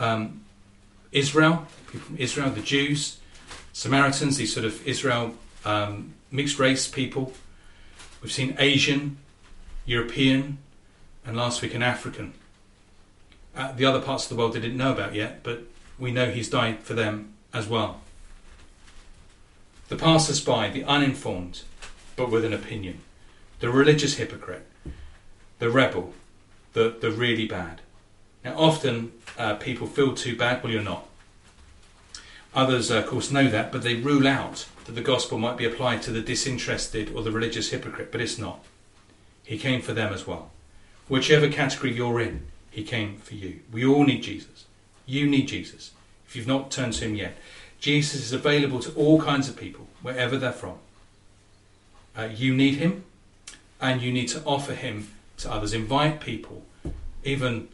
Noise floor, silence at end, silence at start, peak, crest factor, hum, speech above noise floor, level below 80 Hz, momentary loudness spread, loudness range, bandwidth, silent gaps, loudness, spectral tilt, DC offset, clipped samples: -56 dBFS; 0 s; 0 s; -4 dBFS; 24 dB; none; 31 dB; -48 dBFS; 19 LU; 4 LU; 11.5 kHz; none; -25 LUFS; -4.5 dB/octave; under 0.1%; under 0.1%